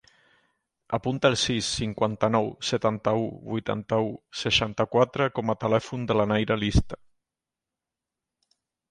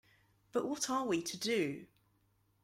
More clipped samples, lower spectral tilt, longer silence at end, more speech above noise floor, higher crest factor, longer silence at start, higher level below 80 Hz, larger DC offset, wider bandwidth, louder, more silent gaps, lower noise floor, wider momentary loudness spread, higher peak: neither; first, -5 dB/octave vs -3.5 dB/octave; first, 1.95 s vs 0.8 s; first, 63 dB vs 38 dB; about the same, 20 dB vs 18 dB; first, 0.9 s vs 0.55 s; first, -42 dBFS vs -78 dBFS; neither; second, 11 kHz vs 16.5 kHz; first, -26 LUFS vs -36 LUFS; neither; first, -88 dBFS vs -74 dBFS; about the same, 7 LU vs 6 LU; first, -6 dBFS vs -22 dBFS